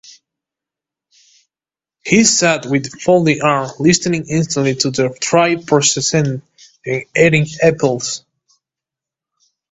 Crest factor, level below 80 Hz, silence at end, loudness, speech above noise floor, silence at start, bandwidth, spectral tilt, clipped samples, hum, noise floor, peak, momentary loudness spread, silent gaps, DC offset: 16 dB; -52 dBFS; 1.55 s; -14 LUFS; over 76 dB; 2.05 s; 8.2 kHz; -4 dB/octave; under 0.1%; none; under -90 dBFS; 0 dBFS; 10 LU; none; under 0.1%